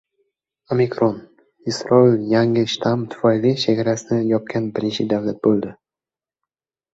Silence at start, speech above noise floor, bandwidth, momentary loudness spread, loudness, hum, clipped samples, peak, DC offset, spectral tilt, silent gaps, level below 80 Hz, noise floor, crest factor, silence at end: 0.7 s; over 72 dB; 8 kHz; 9 LU; -19 LUFS; none; under 0.1%; -2 dBFS; under 0.1%; -6.5 dB/octave; none; -58 dBFS; under -90 dBFS; 18 dB; 1.2 s